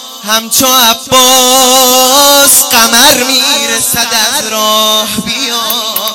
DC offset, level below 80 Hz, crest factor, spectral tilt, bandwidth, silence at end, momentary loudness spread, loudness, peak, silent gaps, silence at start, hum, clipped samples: under 0.1%; -44 dBFS; 8 dB; 0 dB/octave; over 20 kHz; 0 s; 8 LU; -6 LUFS; 0 dBFS; none; 0 s; none; 2%